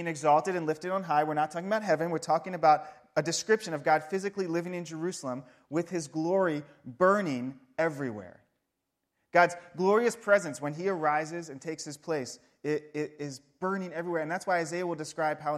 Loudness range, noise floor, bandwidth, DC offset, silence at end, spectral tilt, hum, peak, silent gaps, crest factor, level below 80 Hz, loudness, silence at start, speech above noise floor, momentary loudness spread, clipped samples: 5 LU; -83 dBFS; 14.5 kHz; under 0.1%; 0 s; -5 dB/octave; none; -8 dBFS; none; 22 dB; -78 dBFS; -30 LUFS; 0 s; 54 dB; 12 LU; under 0.1%